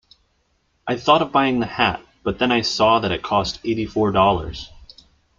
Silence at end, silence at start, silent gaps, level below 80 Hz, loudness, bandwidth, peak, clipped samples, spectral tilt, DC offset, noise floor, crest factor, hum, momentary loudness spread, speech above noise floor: 0.55 s; 0.85 s; none; -44 dBFS; -19 LUFS; 7.6 kHz; -2 dBFS; under 0.1%; -5 dB/octave; under 0.1%; -66 dBFS; 18 dB; none; 11 LU; 47 dB